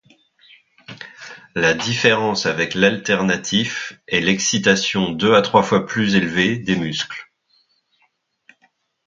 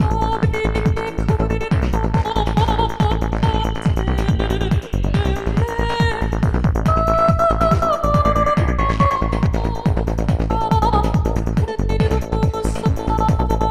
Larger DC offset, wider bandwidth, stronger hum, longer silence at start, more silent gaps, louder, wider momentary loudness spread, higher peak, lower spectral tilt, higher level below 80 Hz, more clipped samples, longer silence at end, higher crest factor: neither; second, 7.6 kHz vs 14 kHz; neither; first, 0.9 s vs 0 s; neither; about the same, -18 LUFS vs -19 LUFS; first, 13 LU vs 4 LU; about the same, 0 dBFS vs -2 dBFS; second, -4 dB/octave vs -7 dB/octave; second, -54 dBFS vs -22 dBFS; neither; first, 1.85 s vs 0 s; about the same, 20 dB vs 16 dB